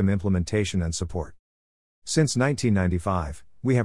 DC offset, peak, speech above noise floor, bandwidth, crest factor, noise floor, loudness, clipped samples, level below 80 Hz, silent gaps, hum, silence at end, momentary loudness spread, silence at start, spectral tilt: 0.4%; -8 dBFS; over 66 dB; 12 kHz; 18 dB; under -90 dBFS; -25 LUFS; under 0.1%; -44 dBFS; 1.39-2.02 s; none; 0 s; 12 LU; 0 s; -5.5 dB/octave